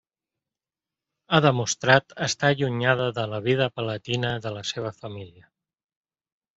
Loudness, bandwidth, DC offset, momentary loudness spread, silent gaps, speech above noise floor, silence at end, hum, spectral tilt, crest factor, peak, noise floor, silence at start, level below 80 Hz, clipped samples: -24 LUFS; 8 kHz; under 0.1%; 12 LU; none; over 66 dB; 1.25 s; none; -4.5 dB/octave; 24 dB; -2 dBFS; under -90 dBFS; 1.3 s; -62 dBFS; under 0.1%